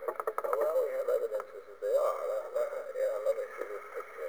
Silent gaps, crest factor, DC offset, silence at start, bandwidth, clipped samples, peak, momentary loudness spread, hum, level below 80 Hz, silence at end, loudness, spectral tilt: none; 18 dB; 0.1%; 0 s; over 20 kHz; under 0.1%; -16 dBFS; 10 LU; none; -80 dBFS; 0 s; -34 LUFS; -2.5 dB/octave